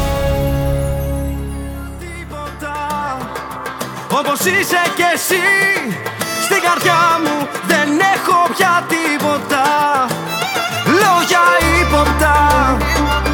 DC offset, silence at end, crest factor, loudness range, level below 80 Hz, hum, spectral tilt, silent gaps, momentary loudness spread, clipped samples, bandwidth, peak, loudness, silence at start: under 0.1%; 0 s; 14 dB; 9 LU; -26 dBFS; none; -4 dB/octave; none; 14 LU; under 0.1%; 19.5 kHz; -2 dBFS; -14 LUFS; 0 s